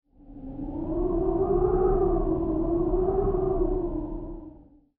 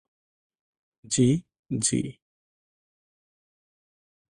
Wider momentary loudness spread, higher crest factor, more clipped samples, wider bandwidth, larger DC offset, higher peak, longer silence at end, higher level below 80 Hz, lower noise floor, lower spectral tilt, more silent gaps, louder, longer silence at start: first, 15 LU vs 11 LU; second, 14 dB vs 20 dB; neither; second, 2.1 kHz vs 11.5 kHz; neither; about the same, -12 dBFS vs -10 dBFS; second, 0.4 s vs 2.2 s; first, -34 dBFS vs -60 dBFS; second, -51 dBFS vs under -90 dBFS; first, -14 dB/octave vs -5 dB/octave; second, none vs 1.59-1.63 s; about the same, -26 LUFS vs -26 LUFS; second, 0.25 s vs 1.1 s